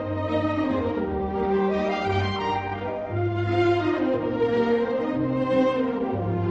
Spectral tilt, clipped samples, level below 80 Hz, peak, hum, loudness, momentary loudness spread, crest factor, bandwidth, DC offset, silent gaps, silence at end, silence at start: -8 dB/octave; under 0.1%; -44 dBFS; -10 dBFS; none; -25 LUFS; 5 LU; 14 dB; 8 kHz; under 0.1%; none; 0 s; 0 s